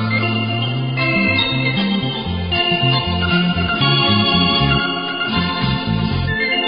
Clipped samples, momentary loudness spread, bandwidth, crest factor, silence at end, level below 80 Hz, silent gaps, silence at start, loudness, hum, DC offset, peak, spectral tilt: under 0.1%; 6 LU; 5.2 kHz; 14 dB; 0 s; -32 dBFS; none; 0 s; -16 LUFS; none; 0.3%; -2 dBFS; -10.5 dB/octave